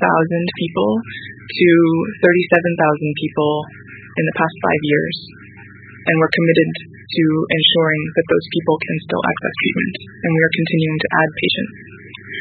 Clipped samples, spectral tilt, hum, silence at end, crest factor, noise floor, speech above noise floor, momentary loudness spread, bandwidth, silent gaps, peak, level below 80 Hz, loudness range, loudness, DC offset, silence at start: under 0.1%; -9 dB/octave; none; 0 s; 18 dB; -39 dBFS; 22 dB; 14 LU; 4.8 kHz; none; 0 dBFS; -54 dBFS; 3 LU; -17 LUFS; under 0.1%; 0 s